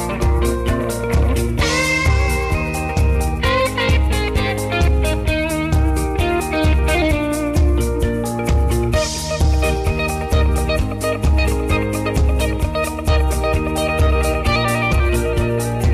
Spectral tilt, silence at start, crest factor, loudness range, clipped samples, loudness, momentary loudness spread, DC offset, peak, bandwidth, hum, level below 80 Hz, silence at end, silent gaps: -5.5 dB/octave; 0 s; 12 dB; 1 LU; under 0.1%; -18 LUFS; 3 LU; under 0.1%; -6 dBFS; 14 kHz; none; -20 dBFS; 0 s; none